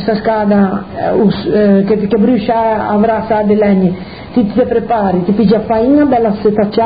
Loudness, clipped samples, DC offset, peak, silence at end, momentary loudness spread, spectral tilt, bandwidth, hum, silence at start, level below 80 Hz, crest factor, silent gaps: -12 LUFS; under 0.1%; 0.6%; 0 dBFS; 0 s; 5 LU; -13 dB/octave; 5 kHz; none; 0 s; -38 dBFS; 12 dB; none